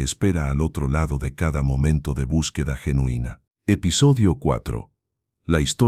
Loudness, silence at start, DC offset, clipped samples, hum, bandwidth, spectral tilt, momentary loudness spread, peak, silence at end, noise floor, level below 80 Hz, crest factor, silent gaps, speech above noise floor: -22 LUFS; 0 s; under 0.1%; under 0.1%; none; 14.5 kHz; -5.5 dB/octave; 11 LU; -4 dBFS; 0 s; -79 dBFS; -30 dBFS; 16 dB; none; 58 dB